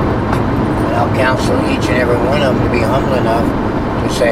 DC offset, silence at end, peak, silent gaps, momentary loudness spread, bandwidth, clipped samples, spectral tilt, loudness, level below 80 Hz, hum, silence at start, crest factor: under 0.1%; 0 s; 0 dBFS; none; 3 LU; 15.5 kHz; under 0.1%; -6.5 dB/octave; -14 LUFS; -26 dBFS; none; 0 s; 12 dB